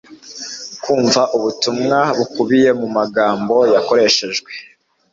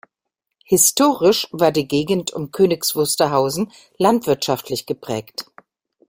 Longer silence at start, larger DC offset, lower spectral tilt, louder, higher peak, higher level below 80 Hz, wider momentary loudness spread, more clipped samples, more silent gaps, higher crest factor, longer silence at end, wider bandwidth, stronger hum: second, 0.1 s vs 0.7 s; neither; about the same, -3.5 dB/octave vs -3.5 dB/octave; first, -15 LUFS vs -18 LUFS; about the same, -2 dBFS vs 0 dBFS; about the same, -60 dBFS vs -58 dBFS; first, 15 LU vs 12 LU; neither; neither; about the same, 14 dB vs 18 dB; second, 0.5 s vs 0.65 s; second, 7.8 kHz vs 16.5 kHz; neither